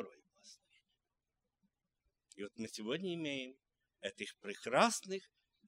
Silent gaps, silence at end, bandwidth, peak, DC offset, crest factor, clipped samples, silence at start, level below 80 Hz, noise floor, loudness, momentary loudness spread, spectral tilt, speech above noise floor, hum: none; 0.45 s; 16 kHz; -16 dBFS; under 0.1%; 26 dB; under 0.1%; 0 s; -88 dBFS; -90 dBFS; -39 LUFS; 19 LU; -3.5 dB/octave; 50 dB; none